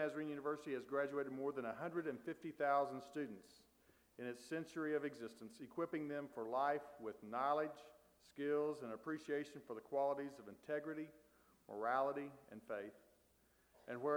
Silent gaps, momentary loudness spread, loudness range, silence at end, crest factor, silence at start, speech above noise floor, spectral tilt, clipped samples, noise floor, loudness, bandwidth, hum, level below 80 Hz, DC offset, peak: none; 14 LU; 3 LU; 0 s; 20 dB; 0 s; 31 dB; -6 dB/octave; under 0.1%; -75 dBFS; -44 LUFS; over 20 kHz; none; -86 dBFS; under 0.1%; -26 dBFS